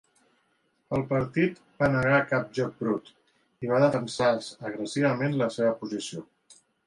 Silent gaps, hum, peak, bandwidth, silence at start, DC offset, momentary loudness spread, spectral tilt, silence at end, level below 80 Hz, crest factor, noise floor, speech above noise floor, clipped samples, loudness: none; none; -10 dBFS; 11.5 kHz; 0.9 s; under 0.1%; 11 LU; -6 dB/octave; 0.6 s; -58 dBFS; 18 dB; -71 dBFS; 45 dB; under 0.1%; -27 LUFS